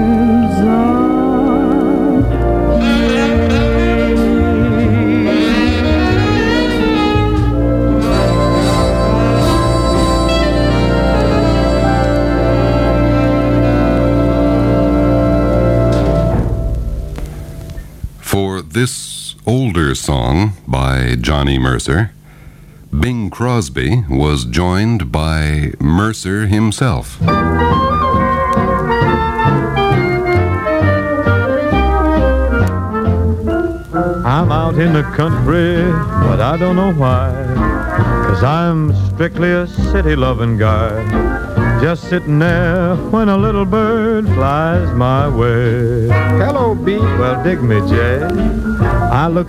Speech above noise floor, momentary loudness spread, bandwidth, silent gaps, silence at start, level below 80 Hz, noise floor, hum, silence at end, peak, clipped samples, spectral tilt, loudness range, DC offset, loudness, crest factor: 24 dB; 4 LU; 15.5 kHz; none; 0 s; -22 dBFS; -37 dBFS; none; 0 s; 0 dBFS; under 0.1%; -7 dB/octave; 4 LU; under 0.1%; -14 LUFS; 12 dB